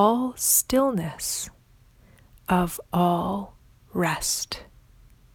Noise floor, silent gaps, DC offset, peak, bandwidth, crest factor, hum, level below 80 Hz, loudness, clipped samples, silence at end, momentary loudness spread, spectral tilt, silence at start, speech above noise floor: -56 dBFS; none; under 0.1%; -8 dBFS; over 20 kHz; 18 dB; none; -50 dBFS; -24 LUFS; under 0.1%; 0.7 s; 15 LU; -4 dB/octave; 0 s; 32 dB